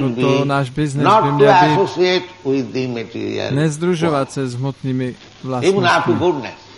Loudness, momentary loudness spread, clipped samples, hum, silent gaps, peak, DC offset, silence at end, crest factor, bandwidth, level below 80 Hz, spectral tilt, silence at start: -17 LUFS; 12 LU; under 0.1%; none; none; 0 dBFS; under 0.1%; 0.05 s; 16 dB; 11.5 kHz; -52 dBFS; -6 dB/octave; 0 s